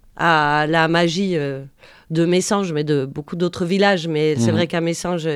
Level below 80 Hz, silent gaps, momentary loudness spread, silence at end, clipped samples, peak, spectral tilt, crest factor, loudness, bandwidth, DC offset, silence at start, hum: -52 dBFS; none; 8 LU; 0 s; under 0.1%; -2 dBFS; -5 dB/octave; 16 dB; -19 LUFS; 13 kHz; under 0.1%; 0.15 s; none